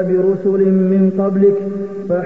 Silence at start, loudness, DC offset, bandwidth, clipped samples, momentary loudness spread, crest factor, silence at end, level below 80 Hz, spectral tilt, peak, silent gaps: 0 s; -15 LUFS; 0.6%; 2.8 kHz; under 0.1%; 8 LU; 12 dB; 0 s; -58 dBFS; -11.5 dB/octave; -4 dBFS; none